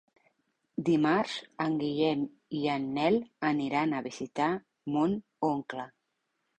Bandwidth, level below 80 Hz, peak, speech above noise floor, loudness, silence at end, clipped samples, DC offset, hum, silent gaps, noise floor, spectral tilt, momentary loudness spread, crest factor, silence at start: 8.8 kHz; -70 dBFS; -14 dBFS; 51 dB; -31 LUFS; 0.7 s; under 0.1%; under 0.1%; none; none; -80 dBFS; -6.5 dB/octave; 9 LU; 18 dB; 0.8 s